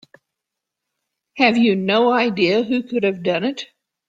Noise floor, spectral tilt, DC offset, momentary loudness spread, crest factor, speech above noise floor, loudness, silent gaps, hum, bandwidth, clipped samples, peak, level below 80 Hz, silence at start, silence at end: -82 dBFS; -6 dB/octave; under 0.1%; 9 LU; 18 dB; 65 dB; -18 LUFS; none; none; 7.8 kHz; under 0.1%; -2 dBFS; -64 dBFS; 1.35 s; 0.45 s